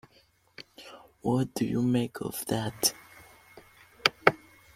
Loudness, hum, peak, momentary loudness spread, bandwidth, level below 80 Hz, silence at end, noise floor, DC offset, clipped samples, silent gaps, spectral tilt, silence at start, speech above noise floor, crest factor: -28 LUFS; none; -2 dBFS; 23 LU; 16.5 kHz; -62 dBFS; 0.4 s; -64 dBFS; under 0.1%; under 0.1%; none; -4 dB/octave; 0.6 s; 35 dB; 28 dB